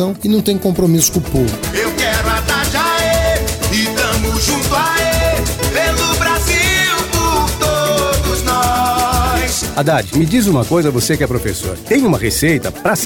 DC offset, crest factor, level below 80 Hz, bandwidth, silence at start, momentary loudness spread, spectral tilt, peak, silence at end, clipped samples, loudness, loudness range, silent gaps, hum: under 0.1%; 14 dB; -24 dBFS; 18 kHz; 0 s; 4 LU; -4 dB/octave; 0 dBFS; 0 s; under 0.1%; -14 LUFS; 1 LU; none; none